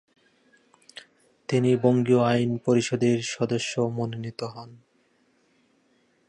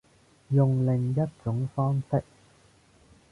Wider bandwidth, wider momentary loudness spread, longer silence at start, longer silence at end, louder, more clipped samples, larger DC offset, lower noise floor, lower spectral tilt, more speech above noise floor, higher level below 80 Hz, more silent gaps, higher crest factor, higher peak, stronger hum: about the same, 10.5 kHz vs 9.6 kHz; first, 23 LU vs 7 LU; first, 1.5 s vs 0.5 s; first, 1.55 s vs 1.1 s; first, -24 LUFS vs -27 LUFS; neither; neither; first, -66 dBFS vs -59 dBFS; second, -6 dB/octave vs -10.5 dB/octave; first, 42 dB vs 34 dB; second, -66 dBFS vs -58 dBFS; neither; about the same, 18 dB vs 16 dB; first, -8 dBFS vs -12 dBFS; neither